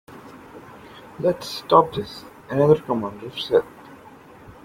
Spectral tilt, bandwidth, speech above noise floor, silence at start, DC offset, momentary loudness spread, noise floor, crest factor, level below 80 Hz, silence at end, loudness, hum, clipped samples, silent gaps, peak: -6.5 dB/octave; 16.5 kHz; 25 dB; 0.1 s; under 0.1%; 25 LU; -45 dBFS; 22 dB; -56 dBFS; 0.15 s; -21 LUFS; none; under 0.1%; none; -2 dBFS